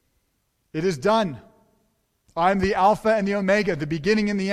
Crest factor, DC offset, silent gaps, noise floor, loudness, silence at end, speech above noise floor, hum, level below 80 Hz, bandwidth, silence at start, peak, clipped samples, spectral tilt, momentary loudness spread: 18 dB; under 0.1%; none; -71 dBFS; -22 LUFS; 0 s; 50 dB; none; -50 dBFS; 13 kHz; 0.75 s; -6 dBFS; under 0.1%; -6 dB/octave; 10 LU